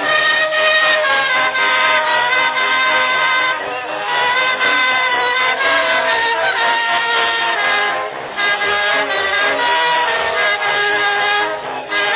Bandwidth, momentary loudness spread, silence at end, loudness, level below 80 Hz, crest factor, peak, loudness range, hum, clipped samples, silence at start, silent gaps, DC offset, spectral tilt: 4 kHz; 5 LU; 0 s; -14 LUFS; -56 dBFS; 14 dB; -2 dBFS; 2 LU; none; under 0.1%; 0 s; none; under 0.1%; -4.5 dB/octave